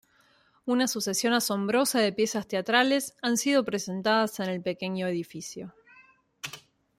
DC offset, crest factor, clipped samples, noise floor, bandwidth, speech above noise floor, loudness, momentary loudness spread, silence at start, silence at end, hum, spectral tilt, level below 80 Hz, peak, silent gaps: under 0.1%; 20 dB; under 0.1%; -64 dBFS; 16 kHz; 37 dB; -27 LUFS; 16 LU; 0.65 s; 0.4 s; none; -3.5 dB/octave; -72 dBFS; -8 dBFS; none